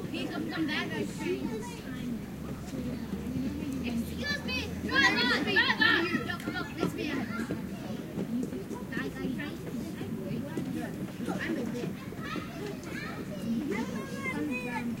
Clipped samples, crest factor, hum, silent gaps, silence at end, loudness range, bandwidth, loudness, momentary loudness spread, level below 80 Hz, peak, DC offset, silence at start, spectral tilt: under 0.1%; 22 dB; none; none; 0 s; 9 LU; 16 kHz; -32 LUFS; 13 LU; -54 dBFS; -12 dBFS; under 0.1%; 0 s; -5 dB/octave